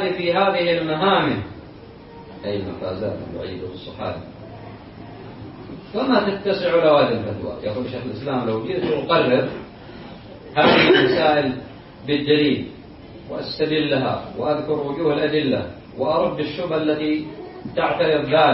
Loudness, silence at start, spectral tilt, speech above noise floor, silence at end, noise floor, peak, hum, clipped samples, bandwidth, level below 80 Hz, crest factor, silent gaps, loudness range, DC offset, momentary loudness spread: -20 LUFS; 0 s; -10 dB/octave; 21 dB; 0 s; -41 dBFS; -2 dBFS; none; under 0.1%; 5.8 kHz; -50 dBFS; 20 dB; none; 12 LU; under 0.1%; 22 LU